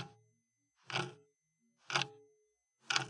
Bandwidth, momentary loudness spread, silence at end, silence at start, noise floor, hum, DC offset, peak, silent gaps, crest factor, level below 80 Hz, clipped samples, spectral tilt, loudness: 11.5 kHz; 10 LU; 0 s; 0 s; -81 dBFS; none; under 0.1%; -14 dBFS; none; 30 dB; -90 dBFS; under 0.1%; -2 dB/octave; -39 LUFS